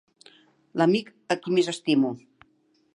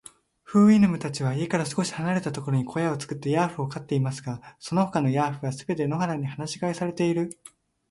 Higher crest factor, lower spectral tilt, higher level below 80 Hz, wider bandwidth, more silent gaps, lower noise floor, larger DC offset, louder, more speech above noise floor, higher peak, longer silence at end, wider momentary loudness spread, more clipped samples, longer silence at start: about the same, 20 dB vs 16 dB; about the same, -5.5 dB/octave vs -6.5 dB/octave; second, -78 dBFS vs -62 dBFS; about the same, 11 kHz vs 11.5 kHz; neither; first, -66 dBFS vs -49 dBFS; neither; about the same, -25 LUFS vs -26 LUFS; first, 42 dB vs 24 dB; about the same, -8 dBFS vs -8 dBFS; first, 0.75 s vs 0.6 s; about the same, 9 LU vs 11 LU; neither; first, 0.75 s vs 0.5 s